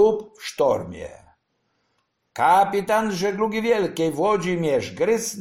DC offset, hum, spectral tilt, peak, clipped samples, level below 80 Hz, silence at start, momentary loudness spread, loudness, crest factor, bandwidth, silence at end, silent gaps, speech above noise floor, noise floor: under 0.1%; none; -4.5 dB/octave; -6 dBFS; under 0.1%; -56 dBFS; 0 s; 15 LU; -22 LUFS; 16 dB; 16.5 kHz; 0 s; none; 50 dB; -71 dBFS